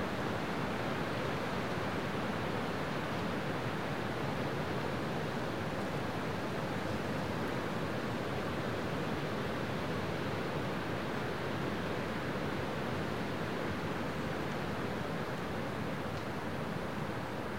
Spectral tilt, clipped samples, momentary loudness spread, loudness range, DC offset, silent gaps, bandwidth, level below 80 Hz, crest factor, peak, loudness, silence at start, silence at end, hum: -6 dB/octave; under 0.1%; 2 LU; 1 LU; 0.4%; none; 16 kHz; -56 dBFS; 14 dB; -24 dBFS; -37 LUFS; 0 s; 0 s; none